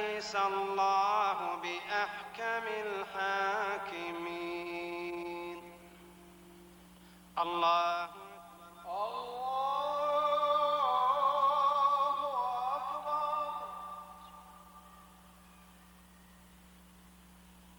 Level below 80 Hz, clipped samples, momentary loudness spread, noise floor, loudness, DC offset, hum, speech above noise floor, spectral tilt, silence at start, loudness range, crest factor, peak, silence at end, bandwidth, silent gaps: -68 dBFS; under 0.1%; 19 LU; -58 dBFS; -33 LUFS; under 0.1%; 60 Hz at -65 dBFS; 25 dB; -3.5 dB/octave; 0 s; 12 LU; 16 dB; -18 dBFS; 0.05 s; over 20 kHz; none